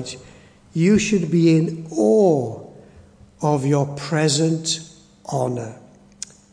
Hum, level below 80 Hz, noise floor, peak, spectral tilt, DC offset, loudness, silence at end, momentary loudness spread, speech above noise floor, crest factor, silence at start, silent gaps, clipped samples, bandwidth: none; -54 dBFS; -48 dBFS; -4 dBFS; -5.5 dB/octave; under 0.1%; -20 LUFS; 0.75 s; 20 LU; 29 dB; 16 dB; 0 s; none; under 0.1%; 10.5 kHz